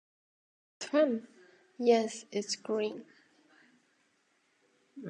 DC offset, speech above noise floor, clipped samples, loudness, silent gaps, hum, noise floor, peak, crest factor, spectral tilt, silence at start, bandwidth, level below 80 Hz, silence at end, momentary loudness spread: under 0.1%; 43 dB; under 0.1%; -31 LUFS; none; none; -73 dBFS; -14 dBFS; 22 dB; -4 dB/octave; 0.8 s; 10.5 kHz; under -90 dBFS; 0 s; 11 LU